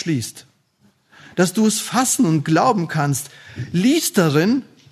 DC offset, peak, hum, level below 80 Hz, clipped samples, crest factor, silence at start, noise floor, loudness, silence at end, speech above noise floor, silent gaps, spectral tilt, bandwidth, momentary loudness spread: under 0.1%; -2 dBFS; none; -62 dBFS; under 0.1%; 16 dB; 0 s; -59 dBFS; -18 LUFS; 0.3 s; 41 dB; none; -4.5 dB/octave; 13.5 kHz; 10 LU